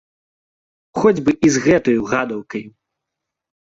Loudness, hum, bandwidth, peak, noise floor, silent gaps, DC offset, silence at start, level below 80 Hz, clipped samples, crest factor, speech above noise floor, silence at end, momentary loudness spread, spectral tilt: -17 LUFS; none; 8 kHz; -2 dBFS; -82 dBFS; none; under 0.1%; 0.95 s; -52 dBFS; under 0.1%; 18 dB; 65 dB; 1.1 s; 14 LU; -5.5 dB/octave